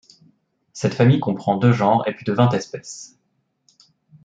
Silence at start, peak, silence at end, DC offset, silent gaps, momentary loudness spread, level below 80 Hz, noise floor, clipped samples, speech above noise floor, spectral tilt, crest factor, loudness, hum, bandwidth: 0.75 s; -2 dBFS; 1.2 s; under 0.1%; none; 18 LU; -62 dBFS; -70 dBFS; under 0.1%; 51 dB; -7 dB/octave; 18 dB; -19 LUFS; none; 7.8 kHz